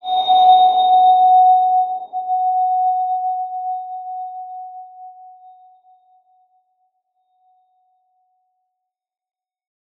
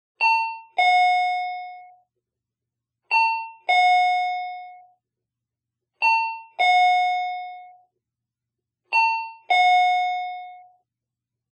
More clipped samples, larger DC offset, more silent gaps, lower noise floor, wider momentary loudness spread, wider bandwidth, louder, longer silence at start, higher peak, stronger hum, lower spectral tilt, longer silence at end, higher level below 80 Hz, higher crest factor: neither; neither; neither; second, -79 dBFS vs -86 dBFS; first, 20 LU vs 16 LU; second, 4.2 kHz vs 8.4 kHz; first, -15 LUFS vs -20 LUFS; second, 0.05 s vs 0.2 s; first, -2 dBFS vs -10 dBFS; neither; first, -3.5 dB/octave vs 2.5 dB/octave; first, 4.85 s vs 0.9 s; about the same, -88 dBFS vs under -90 dBFS; about the same, 16 dB vs 14 dB